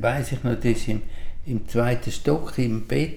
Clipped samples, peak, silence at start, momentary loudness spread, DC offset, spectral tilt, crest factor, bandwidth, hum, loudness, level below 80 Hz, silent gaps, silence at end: under 0.1%; -8 dBFS; 0 s; 8 LU; under 0.1%; -6.5 dB/octave; 16 dB; 15 kHz; none; -25 LUFS; -34 dBFS; none; 0 s